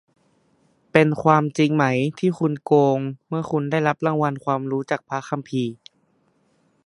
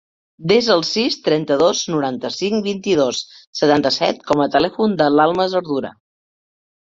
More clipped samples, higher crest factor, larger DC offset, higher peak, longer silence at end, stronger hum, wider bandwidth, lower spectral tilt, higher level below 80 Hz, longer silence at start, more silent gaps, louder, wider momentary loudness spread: neither; first, 22 dB vs 16 dB; neither; about the same, 0 dBFS vs -2 dBFS; about the same, 1.1 s vs 1 s; neither; first, 11 kHz vs 7.8 kHz; first, -7 dB/octave vs -4.5 dB/octave; second, -62 dBFS vs -56 dBFS; first, 0.95 s vs 0.4 s; second, none vs 3.47-3.53 s; second, -21 LUFS vs -17 LUFS; about the same, 9 LU vs 9 LU